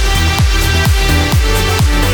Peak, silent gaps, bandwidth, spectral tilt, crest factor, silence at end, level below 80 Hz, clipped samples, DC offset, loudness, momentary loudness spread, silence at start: 0 dBFS; none; over 20 kHz; -4 dB/octave; 10 dB; 0 s; -14 dBFS; under 0.1%; under 0.1%; -12 LUFS; 1 LU; 0 s